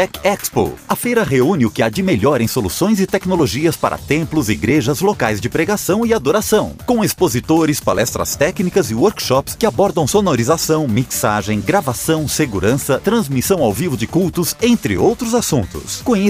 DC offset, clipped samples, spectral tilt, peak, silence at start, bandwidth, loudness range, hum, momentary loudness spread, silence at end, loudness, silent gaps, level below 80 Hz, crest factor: under 0.1%; under 0.1%; -5 dB/octave; 0 dBFS; 0 s; 16 kHz; 1 LU; none; 3 LU; 0 s; -16 LUFS; none; -40 dBFS; 14 dB